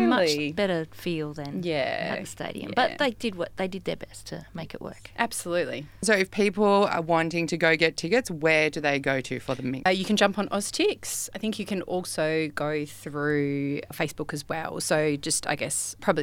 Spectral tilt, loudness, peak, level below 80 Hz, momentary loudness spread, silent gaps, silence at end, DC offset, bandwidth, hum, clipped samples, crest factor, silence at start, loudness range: -4 dB/octave; -26 LUFS; -6 dBFS; -58 dBFS; 11 LU; none; 0 s; under 0.1%; 18 kHz; none; under 0.1%; 22 dB; 0 s; 6 LU